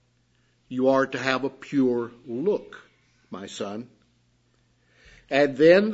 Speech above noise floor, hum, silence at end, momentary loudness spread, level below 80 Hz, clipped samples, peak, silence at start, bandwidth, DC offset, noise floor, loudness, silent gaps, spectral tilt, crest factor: 43 dB; none; 0 s; 20 LU; -68 dBFS; under 0.1%; -4 dBFS; 0.7 s; 8 kHz; under 0.1%; -66 dBFS; -24 LUFS; none; -6 dB/octave; 22 dB